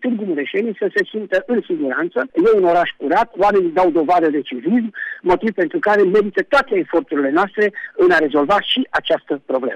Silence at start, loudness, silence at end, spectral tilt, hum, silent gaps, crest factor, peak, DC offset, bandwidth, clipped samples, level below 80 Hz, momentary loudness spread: 0 s; -17 LUFS; 0 s; -6 dB/octave; none; none; 10 dB; -6 dBFS; under 0.1%; 9.4 kHz; under 0.1%; -52 dBFS; 7 LU